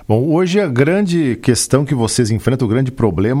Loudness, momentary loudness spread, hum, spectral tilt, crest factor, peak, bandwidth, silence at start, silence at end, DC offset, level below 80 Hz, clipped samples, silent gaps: -15 LUFS; 2 LU; none; -6 dB/octave; 14 dB; 0 dBFS; 16 kHz; 0.1 s; 0 s; under 0.1%; -40 dBFS; under 0.1%; none